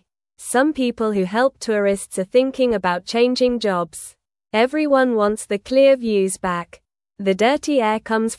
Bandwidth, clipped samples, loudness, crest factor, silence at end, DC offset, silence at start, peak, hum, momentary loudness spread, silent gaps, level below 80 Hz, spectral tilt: 12 kHz; under 0.1%; -19 LUFS; 14 dB; 0.05 s; under 0.1%; 0.4 s; -4 dBFS; none; 9 LU; none; -54 dBFS; -4.5 dB/octave